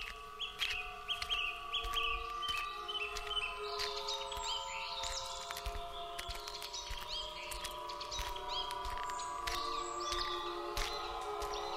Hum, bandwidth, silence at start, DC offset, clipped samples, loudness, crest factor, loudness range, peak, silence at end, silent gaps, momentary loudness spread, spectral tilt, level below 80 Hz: none; 16 kHz; 0 s; under 0.1%; under 0.1%; -39 LUFS; 22 dB; 4 LU; -18 dBFS; 0 s; none; 7 LU; -1.5 dB/octave; -52 dBFS